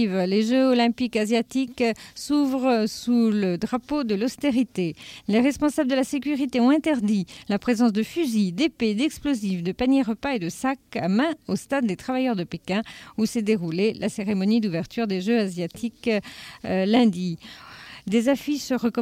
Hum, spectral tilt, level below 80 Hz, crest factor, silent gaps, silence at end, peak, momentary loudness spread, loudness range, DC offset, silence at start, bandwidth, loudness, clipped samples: none; -5.5 dB/octave; -56 dBFS; 16 dB; none; 0 s; -8 dBFS; 8 LU; 3 LU; under 0.1%; 0 s; 15.5 kHz; -24 LUFS; under 0.1%